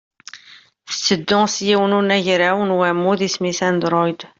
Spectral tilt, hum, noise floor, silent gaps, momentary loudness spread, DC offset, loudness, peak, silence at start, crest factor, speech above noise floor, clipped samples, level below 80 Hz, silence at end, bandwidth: -4 dB/octave; none; -47 dBFS; none; 5 LU; under 0.1%; -17 LUFS; -2 dBFS; 0.35 s; 16 dB; 30 dB; under 0.1%; -60 dBFS; 0.15 s; 7.8 kHz